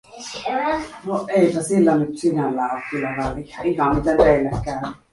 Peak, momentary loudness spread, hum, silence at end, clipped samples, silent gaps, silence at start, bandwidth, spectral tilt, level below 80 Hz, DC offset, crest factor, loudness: -2 dBFS; 11 LU; none; 0.15 s; under 0.1%; none; 0.15 s; 11.5 kHz; -6 dB/octave; -40 dBFS; under 0.1%; 18 dB; -20 LUFS